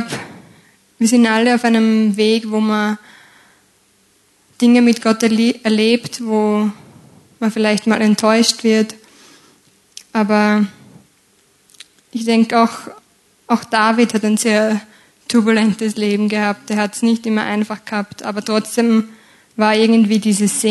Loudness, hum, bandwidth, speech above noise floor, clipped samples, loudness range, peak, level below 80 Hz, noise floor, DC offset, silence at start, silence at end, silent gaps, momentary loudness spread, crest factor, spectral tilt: -15 LUFS; none; 12.5 kHz; 41 dB; under 0.1%; 3 LU; 0 dBFS; -66 dBFS; -56 dBFS; under 0.1%; 0 s; 0 s; none; 11 LU; 16 dB; -4.5 dB/octave